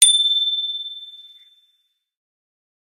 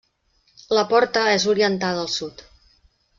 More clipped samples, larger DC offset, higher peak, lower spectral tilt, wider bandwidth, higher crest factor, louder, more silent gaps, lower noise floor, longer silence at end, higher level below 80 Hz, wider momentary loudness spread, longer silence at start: neither; neither; first, 0 dBFS vs -4 dBFS; second, 8.5 dB/octave vs -3.5 dB/octave; first, 16.5 kHz vs 7.6 kHz; about the same, 22 dB vs 18 dB; first, -17 LUFS vs -20 LUFS; neither; first, -68 dBFS vs -64 dBFS; first, 1.7 s vs 0.9 s; second, -90 dBFS vs -58 dBFS; first, 22 LU vs 9 LU; second, 0 s vs 0.7 s